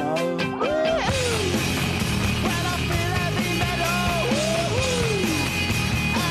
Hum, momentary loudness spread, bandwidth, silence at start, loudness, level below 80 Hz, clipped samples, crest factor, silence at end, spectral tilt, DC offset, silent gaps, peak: none; 2 LU; 13.5 kHz; 0 s; -23 LUFS; -36 dBFS; under 0.1%; 12 dB; 0 s; -4.5 dB/octave; under 0.1%; none; -12 dBFS